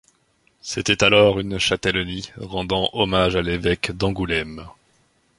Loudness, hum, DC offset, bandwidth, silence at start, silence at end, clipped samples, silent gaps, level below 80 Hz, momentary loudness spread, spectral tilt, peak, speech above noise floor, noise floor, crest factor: -20 LUFS; none; under 0.1%; 11.5 kHz; 0.65 s; 0.7 s; under 0.1%; none; -40 dBFS; 14 LU; -4 dB/octave; -2 dBFS; 42 dB; -63 dBFS; 20 dB